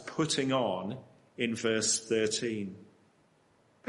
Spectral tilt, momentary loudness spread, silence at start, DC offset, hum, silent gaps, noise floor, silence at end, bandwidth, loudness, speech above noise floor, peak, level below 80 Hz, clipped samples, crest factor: -3 dB/octave; 14 LU; 0 s; under 0.1%; none; none; -67 dBFS; 1.05 s; 11.5 kHz; -31 LUFS; 36 dB; -16 dBFS; -74 dBFS; under 0.1%; 18 dB